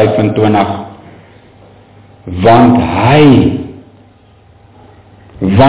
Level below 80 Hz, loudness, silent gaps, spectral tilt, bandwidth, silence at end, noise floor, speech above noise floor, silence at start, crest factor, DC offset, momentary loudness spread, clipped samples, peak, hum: -32 dBFS; -9 LUFS; none; -11.5 dB/octave; 4 kHz; 0 s; -43 dBFS; 35 dB; 0 s; 10 dB; under 0.1%; 18 LU; 0.3%; 0 dBFS; none